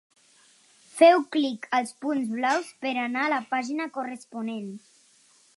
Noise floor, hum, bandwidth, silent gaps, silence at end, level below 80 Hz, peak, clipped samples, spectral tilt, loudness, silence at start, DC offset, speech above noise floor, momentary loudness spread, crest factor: -60 dBFS; none; 11.5 kHz; none; 0.8 s; -84 dBFS; -6 dBFS; under 0.1%; -4 dB/octave; -25 LUFS; 0.95 s; under 0.1%; 35 dB; 17 LU; 22 dB